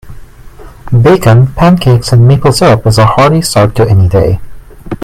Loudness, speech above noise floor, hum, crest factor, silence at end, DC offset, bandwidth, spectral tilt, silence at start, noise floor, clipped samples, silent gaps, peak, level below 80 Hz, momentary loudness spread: -7 LUFS; 24 dB; none; 8 dB; 0 s; under 0.1%; 14.5 kHz; -6.5 dB/octave; 0.05 s; -30 dBFS; 0.8%; none; 0 dBFS; -26 dBFS; 5 LU